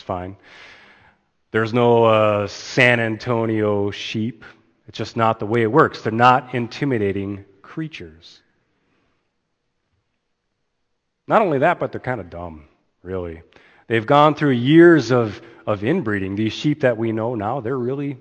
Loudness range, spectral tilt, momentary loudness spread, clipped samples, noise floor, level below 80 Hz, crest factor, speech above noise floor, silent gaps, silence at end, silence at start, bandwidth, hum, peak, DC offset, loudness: 10 LU; -7 dB/octave; 17 LU; under 0.1%; -73 dBFS; -56 dBFS; 20 dB; 54 dB; none; 0.05 s; 0.1 s; 8.6 kHz; none; 0 dBFS; under 0.1%; -18 LUFS